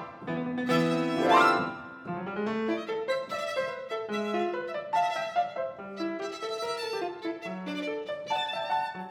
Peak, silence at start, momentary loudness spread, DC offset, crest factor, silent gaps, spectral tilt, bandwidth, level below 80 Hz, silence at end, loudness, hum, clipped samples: -8 dBFS; 0 s; 11 LU; under 0.1%; 22 dB; none; -5 dB/octave; 17.5 kHz; -72 dBFS; 0 s; -30 LUFS; none; under 0.1%